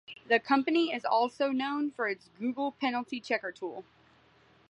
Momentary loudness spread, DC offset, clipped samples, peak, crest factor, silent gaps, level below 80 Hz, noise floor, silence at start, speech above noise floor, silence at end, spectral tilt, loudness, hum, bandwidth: 11 LU; under 0.1%; under 0.1%; -10 dBFS; 20 dB; none; -78 dBFS; -63 dBFS; 0.1 s; 32 dB; 0.9 s; -4.5 dB/octave; -31 LUFS; none; 10 kHz